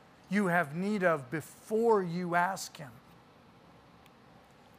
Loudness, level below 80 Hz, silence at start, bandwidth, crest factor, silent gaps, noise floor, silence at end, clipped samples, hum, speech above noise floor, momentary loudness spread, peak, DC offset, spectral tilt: -31 LUFS; -74 dBFS; 0.3 s; 15.5 kHz; 20 dB; none; -58 dBFS; 1.8 s; under 0.1%; none; 28 dB; 13 LU; -14 dBFS; under 0.1%; -6 dB/octave